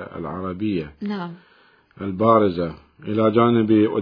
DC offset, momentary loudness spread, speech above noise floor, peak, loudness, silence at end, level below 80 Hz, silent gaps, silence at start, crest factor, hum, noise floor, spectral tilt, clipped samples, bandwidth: under 0.1%; 14 LU; 34 dB; -2 dBFS; -21 LUFS; 0 s; -54 dBFS; none; 0 s; 18 dB; none; -54 dBFS; -10.5 dB/octave; under 0.1%; 5.2 kHz